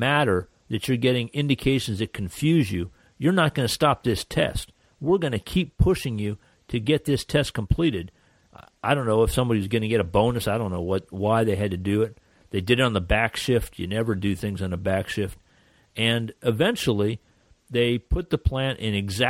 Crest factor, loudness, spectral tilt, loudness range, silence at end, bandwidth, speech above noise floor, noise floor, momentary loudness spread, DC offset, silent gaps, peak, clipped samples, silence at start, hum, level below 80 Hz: 18 dB; -24 LUFS; -6 dB/octave; 2 LU; 0 s; 16.5 kHz; 36 dB; -60 dBFS; 9 LU; under 0.1%; none; -6 dBFS; under 0.1%; 0 s; none; -38 dBFS